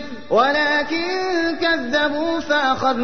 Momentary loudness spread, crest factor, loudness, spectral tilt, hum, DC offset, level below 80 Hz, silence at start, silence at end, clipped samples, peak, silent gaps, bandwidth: 5 LU; 14 dB; -19 LUFS; -4 dB/octave; none; 2%; -52 dBFS; 0 s; 0 s; under 0.1%; -6 dBFS; none; 6.6 kHz